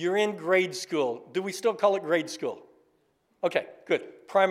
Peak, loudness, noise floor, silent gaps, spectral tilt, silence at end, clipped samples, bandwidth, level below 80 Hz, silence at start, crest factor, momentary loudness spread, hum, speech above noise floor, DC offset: -8 dBFS; -28 LUFS; -70 dBFS; none; -4 dB/octave; 0 s; under 0.1%; 15 kHz; -86 dBFS; 0 s; 20 dB; 8 LU; none; 43 dB; under 0.1%